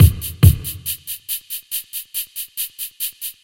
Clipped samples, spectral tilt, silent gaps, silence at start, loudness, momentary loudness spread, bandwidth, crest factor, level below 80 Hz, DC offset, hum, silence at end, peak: 0.1%; -4.5 dB/octave; none; 0 s; -21 LUFS; 11 LU; 17 kHz; 18 dB; -28 dBFS; under 0.1%; none; 0.1 s; 0 dBFS